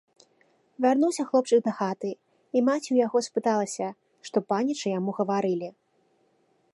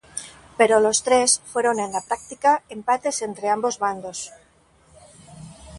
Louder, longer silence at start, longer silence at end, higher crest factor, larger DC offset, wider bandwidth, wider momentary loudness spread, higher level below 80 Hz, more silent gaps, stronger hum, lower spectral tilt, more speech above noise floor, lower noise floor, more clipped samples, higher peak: second, -26 LUFS vs -21 LUFS; first, 0.8 s vs 0.15 s; first, 1.05 s vs 0 s; second, 16 dB vs 22 dB; neither; about the same, 11.5 kHz vs 11.5 kHz; second, 11 LU vs 17 LU; second, -82 dBFS vs -58 dBFS; neither; neither; first, -5.5 dB/octave vs -2 dB/octave; first, 42 dB vs 36 dB; first, -68 dBFS vs -57 dBFS; neither; second, -10 dBFS vs -2 dBFS